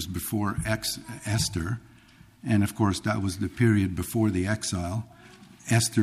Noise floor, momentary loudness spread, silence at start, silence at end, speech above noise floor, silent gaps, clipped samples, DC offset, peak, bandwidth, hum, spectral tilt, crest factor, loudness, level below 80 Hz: -54 dBFS; 11 LU; 0 s; 0 s; 28 dB; none; under 0.1%; under 0.1%; -10 dBFS; 15 kHz; none; -5 dB/octave; 18 dB; -27 LUFS; -48 dBFS